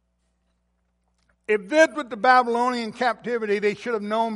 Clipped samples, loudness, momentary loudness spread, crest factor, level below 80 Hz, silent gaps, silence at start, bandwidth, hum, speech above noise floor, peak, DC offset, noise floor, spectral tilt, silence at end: under 0.1%; -22 LUFS; 8 LU; 20 dB; -68 dBFS; none; 1.5 s; 11.5 kHz; 60 Hz at -65 dBFS; 49 dB; -4 dBFS; under 0.1%; -71 dBFS; -4 dB/octave; 0 s